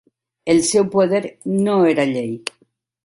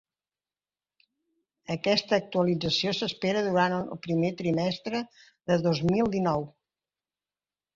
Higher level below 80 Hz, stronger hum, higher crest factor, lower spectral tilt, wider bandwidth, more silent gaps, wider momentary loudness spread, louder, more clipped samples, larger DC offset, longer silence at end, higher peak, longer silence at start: about the same, -58 dBFS vs -62 dBFS; second, none vs 50 Hz at -55 dBFS; about the same, 16 dB vs 20 dB; about the same, -5 dB/octave vs -6 dB/octave; first, 11.5 kHz vs 7.6 kHz; neither; first, 13 LU vs 9 LU; first, -18 LUFS vs -27 LUFS; neither; neither; second, 0.55 s vs 1.25 s; first, -4 dBFS vs -10 dBFS; second, 0.45 s vs 1.7 s